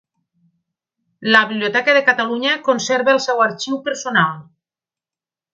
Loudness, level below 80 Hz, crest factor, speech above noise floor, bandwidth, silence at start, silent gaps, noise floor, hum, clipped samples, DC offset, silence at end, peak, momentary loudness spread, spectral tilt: -16 LUFS; -70 dBFS; 18 dB; over 73 dB; 8.2 kHz; 1.2 s; none; under -90 dBFS; none; under 0.1%; under 0.1%; 1.1 s; 0 dBFS; 9 LU; -3.5 dB/octave